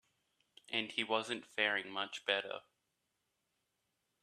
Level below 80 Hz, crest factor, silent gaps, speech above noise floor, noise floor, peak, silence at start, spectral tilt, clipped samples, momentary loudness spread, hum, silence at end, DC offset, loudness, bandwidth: -88 dBFS; 26 dB; none; 46 dB; -85 dBFS; -16 dBFS; 0.7 s; -2.5 dB/octave; under 0.1%; 7 LU; none; 1.65 s; under 0.1%; -37 LUFS; 13.5 kHz